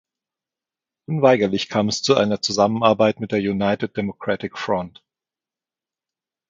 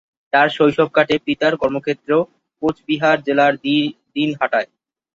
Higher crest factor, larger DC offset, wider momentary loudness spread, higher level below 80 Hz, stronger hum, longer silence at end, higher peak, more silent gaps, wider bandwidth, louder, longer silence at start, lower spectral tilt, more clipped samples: about the same, 20 dB vs 16 dB; neither; about the same, 9 LU vs 8 LU; about the same, -56 dBFS vs -58 dBFS; neither; first, 1.6 s vs 0.5 s; about the same, 0 dBFS vs -2 dBFS; neither; about the same, 7.8 kHz vs 7.6 kHz; about the same, -20 LUFS vs -18 LUFS; first, 1.1 s vs 0.35 s; about the same, -5 dB/octave vs -6 dB/octave; neither